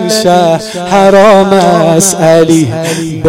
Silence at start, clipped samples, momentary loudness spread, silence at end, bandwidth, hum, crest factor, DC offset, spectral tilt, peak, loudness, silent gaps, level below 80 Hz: 0 s; 2%; 8 LU; 0 s; 17 kHz; none; 6 dB; under 0.1%; -4.5 dB/octave; 0 dBFS; -7 LUFS; none; -42 dBFS